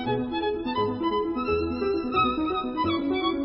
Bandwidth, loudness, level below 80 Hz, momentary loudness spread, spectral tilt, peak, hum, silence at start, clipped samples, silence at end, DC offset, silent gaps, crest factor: 5.8 kHz; -26 LUFS; -46 dBFS; 4 LU; -10 dB/octave; -12 dBFS; none; 0 s; under 0.1%; 0 s; under 0.1%; none; 14 dB